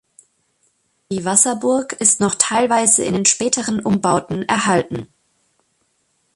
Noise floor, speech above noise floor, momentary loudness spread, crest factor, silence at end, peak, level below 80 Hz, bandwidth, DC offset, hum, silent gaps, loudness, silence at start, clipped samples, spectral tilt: -66 dBFS; 48 dB; 7 LU; 20 dB; 1.3 s; 0 dBFS; -54 dBFS; 12 kHz; under 0.1%; none; none; -16 LUFS; 1.1 s; under 0.1%; -3 dB/octave